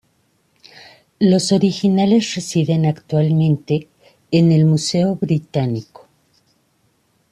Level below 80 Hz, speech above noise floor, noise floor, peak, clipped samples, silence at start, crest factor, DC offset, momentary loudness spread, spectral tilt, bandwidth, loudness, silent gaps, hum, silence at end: -56 dBFS; 46 dB; -62 dBFS; -4 dBFS; under 0.1%; 1.2 s; 14 dB; under 0.1%; 7 LU; -6.5 dB/octave; 11.5 kHz; -17 LUFS; none; none; 1.5 s